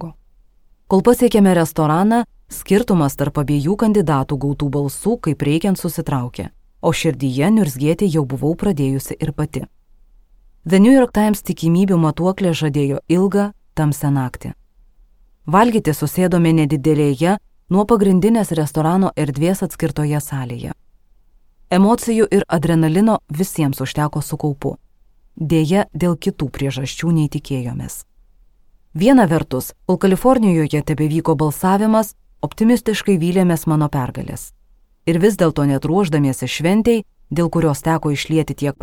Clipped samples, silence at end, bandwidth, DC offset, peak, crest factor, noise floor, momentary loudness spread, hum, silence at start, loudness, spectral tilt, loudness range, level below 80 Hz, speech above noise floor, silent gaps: under 0.1%; 0.1 s; 17.5 kHz; under 0.1%; -2 dBFS; 14 dB; -52 dBFS; 12 LU; none; 0 s; -17 LUFS; -6.5 dB/octave; 4 LU; -42 dBFS; 36 dB; none